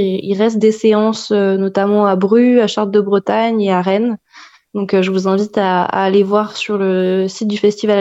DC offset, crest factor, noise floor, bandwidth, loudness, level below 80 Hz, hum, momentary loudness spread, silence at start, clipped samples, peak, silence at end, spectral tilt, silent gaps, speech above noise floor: under 0.1%; 12 dB; -43 dBFS; 8 kHz; -14 LUFS; -62 dBFS; none; 5 LU; 0 s; under 0.1%; -2 dBFS; 0 s; -6.5 dB/octave; none; 29 dB